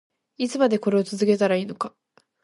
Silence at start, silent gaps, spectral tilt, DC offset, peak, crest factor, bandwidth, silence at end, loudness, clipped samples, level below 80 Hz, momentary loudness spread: 0.4 s; none; -6 dB/octave; under 0.1%; -6 dBFS; 16 dB; 11.5 kHz; 0.55 s; -23 LUFS; under 0.1%; -72 dBFS; 11 LU